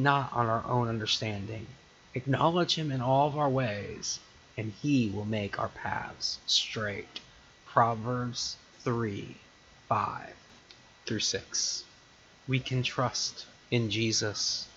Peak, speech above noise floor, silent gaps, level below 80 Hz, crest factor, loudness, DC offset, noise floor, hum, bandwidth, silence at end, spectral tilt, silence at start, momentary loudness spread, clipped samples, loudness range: -8 dBFS; 27 dB; none; -62 dBFS; 22 dB; -30 LUFS; under 0.1%; -58 dBFS; none; 8 kHz; 0.05 s; -4 dB/octave; 0 s; 14 LU; under 0.1%; 5 LU